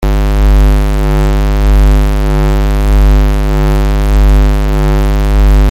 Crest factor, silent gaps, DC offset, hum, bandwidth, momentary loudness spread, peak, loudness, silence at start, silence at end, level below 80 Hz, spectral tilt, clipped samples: 6 dB; none; under 0.1%; none; 15 kHz; 3 LU; -2 dBFS; -11 LUFS; 0 s; 0 s; -8 dBFS; -7 dB/octave; under 0.1%